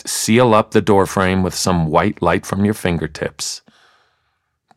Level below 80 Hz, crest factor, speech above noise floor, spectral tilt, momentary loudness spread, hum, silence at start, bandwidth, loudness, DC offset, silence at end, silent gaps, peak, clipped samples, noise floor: -42 dBFS; 16 dB; 53 dB; -5 dB/octave; 11 LU; none; 0.05 s; 16 kHz; -16 LUFS; under 0.1%; 1.2 s; none; -2 dBFS; under 0.1%; -69 dBFS